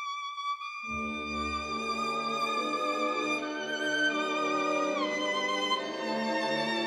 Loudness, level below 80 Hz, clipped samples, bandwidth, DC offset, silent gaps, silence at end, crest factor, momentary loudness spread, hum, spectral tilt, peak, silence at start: -31 LUFS; -60 dBFS; under 0.1%; 13.5 kHz; under 0.1%; none; 0 s; 14 dB; 6 LU; none; -3 dB/octave; -16 dBFS; 0 s